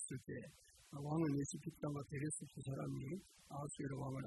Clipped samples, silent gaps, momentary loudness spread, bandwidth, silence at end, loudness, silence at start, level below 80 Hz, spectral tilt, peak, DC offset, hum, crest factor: under 0.1%; none; 12 LU; 12 kHz; 0 s; -46 LUFS; 0 s; -70 dBFS; -6 dB/octave; -30 dBFS; under 0.1%; none; 16 dB